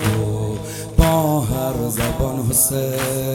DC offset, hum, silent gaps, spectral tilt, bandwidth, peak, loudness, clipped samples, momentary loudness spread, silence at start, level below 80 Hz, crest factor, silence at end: under 0.1%; none; none; -5 dB/octave; 19 kHz; 0 dBFS; -19 LUFS; under 0.1%; 7 LU; 0 s; -28 dBFS; 18 dB; 0 s